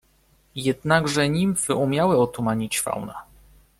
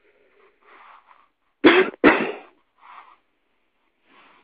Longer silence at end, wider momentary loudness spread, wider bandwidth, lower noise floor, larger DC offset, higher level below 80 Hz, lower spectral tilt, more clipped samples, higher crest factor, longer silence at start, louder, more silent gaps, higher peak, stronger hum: second, 0.55 s vs 2.05 s; about the same, 12 LU vs 14 LU; first, 16 kHz vs 5 kHz; second, -61 dBFS vs -71 dBFS; neither; first, -52 dBFS vs -60 dBFS; second, -4.5 dB/octave vs -9 dB/octave; neither; about the same, 18 dB vs 22 dB; second, 0.55 s vs 1.65 s; second, -22 LUFS vs -17 LUFS; neither; second, -6 dBFS vs -2 dBFS; neither